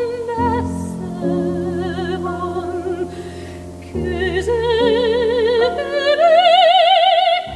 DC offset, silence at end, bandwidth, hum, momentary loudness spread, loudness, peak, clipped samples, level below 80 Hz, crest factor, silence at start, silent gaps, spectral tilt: under 0.1%; 0 s; 11.5 kHz; none; 15 LU; -16 LUFS; -2 dBFS; under 0.1%; -38 dBFS; 14 dB; 0 s; none; -5.5 dB/octave